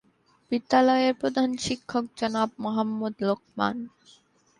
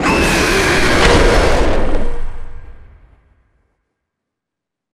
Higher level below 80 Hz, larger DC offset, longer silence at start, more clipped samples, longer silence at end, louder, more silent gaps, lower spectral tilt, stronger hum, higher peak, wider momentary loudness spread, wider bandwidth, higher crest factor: second, -64 dBFS vs -20 dBFS; neither; first, 0.5 s vs 0 s; neither; second, 0.7 s vs 2.1 s; second, -26 LUFS vs -13 LUFS; neither; about the same, -5 dB/octave vs -4 dB/octave; neither; second, -8 dBFS vs 0 dBFS; second, 10 LU vs 15 LU; second, 11 kHz vs 14.5 kHz; about the same, 18 dB vs 14 dB